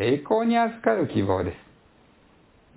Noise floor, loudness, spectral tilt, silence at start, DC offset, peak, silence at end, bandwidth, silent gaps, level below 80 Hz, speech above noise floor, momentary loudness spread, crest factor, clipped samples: -57 dBFS; -24 LUFS; -11 dB/octave; 0 s; under 0.1%; -6 dBFS; 1.2 s; 4 kHz; none; -50 dBFS; 34 dB; 8 LU; 18 dB; under 0.1%